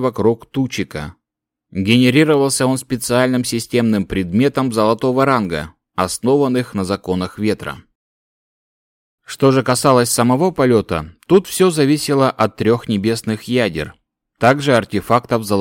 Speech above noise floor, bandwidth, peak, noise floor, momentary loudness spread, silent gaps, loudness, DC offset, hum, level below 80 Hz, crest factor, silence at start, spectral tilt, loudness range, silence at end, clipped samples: 66 dB; 17 kHz; 0 dBFS; -81 dBFS; 11 LU; 7.95-9.18 s; -16 LUFS; under 0.1%; none; -46 dBFS; 16 dB; 0 s; -5 dB/octave; 6 LU; 0 s; under 0.1%